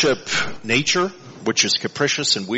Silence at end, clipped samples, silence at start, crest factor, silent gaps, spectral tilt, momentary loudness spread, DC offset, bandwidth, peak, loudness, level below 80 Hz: 0 s; under 0.1%; 0 s; 18 dB; none; -2.5 dB/octave; 5 LU; under 0.1%; 8.2 kHz; -2 dBFS; -19 LUFS; -54 dBFS